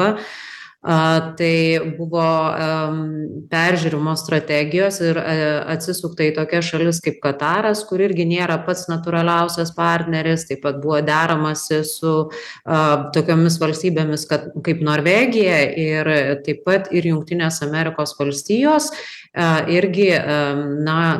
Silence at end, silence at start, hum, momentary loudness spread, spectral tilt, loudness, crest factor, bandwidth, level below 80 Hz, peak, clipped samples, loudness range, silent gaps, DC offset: 0 s; 0 s; none; 7 LU; -5.5 dB/octave; -18 LUFS; 16 dB; 12.5 kHz; -60 dBFS; -2 dBFS; under 0.1%; 2 LU; none; under 0.1%